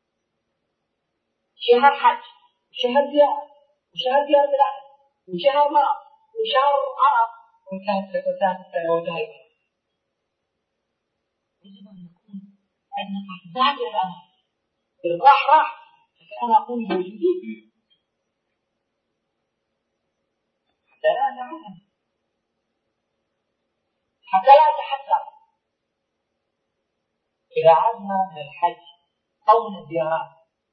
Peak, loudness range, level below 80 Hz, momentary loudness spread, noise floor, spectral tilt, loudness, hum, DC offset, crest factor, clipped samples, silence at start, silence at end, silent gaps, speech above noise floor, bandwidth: 0 dBFS; 10 LU; -80 dBFS; 18 LU; -78 dBFS; -6.5 dB/octave; -20 LUFS; none; under 0.1%; 22 dB; under 0.1%; 1.6 s; 0.45 s; none; 58 dB; 5.8 kHz